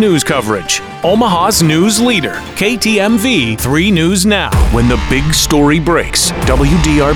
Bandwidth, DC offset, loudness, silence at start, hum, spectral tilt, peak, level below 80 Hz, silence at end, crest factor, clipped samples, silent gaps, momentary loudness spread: 20 kHz; under 0.1%; -11 LUFS; 0 s; none; -4 dB/octave; 0 dBFS; -20 dBFS; 0 s; 10 dB; under 0.1%; none; 5 LU